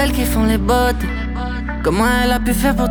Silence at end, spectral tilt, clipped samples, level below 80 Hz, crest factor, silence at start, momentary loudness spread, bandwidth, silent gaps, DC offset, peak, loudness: 0 s; -5 dB/octave; under 0.1%; -22 dBFS; 14 dB; 0 s; 8 LU; over 20 kHz; none; under 0.1%; -2 dBFS; -17 LUFS